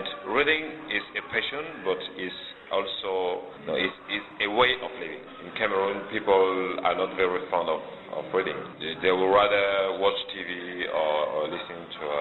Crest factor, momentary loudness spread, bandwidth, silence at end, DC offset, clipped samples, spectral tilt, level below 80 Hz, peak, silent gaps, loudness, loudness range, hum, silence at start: 18 dB; 12 LU; 4.3 kHz; 0 s; under 0.1%; under 0.1%; -6 dB/octave; -62 dBFS; -8 dBFS; none; -27 LUFS; 4 LU; none; 0 s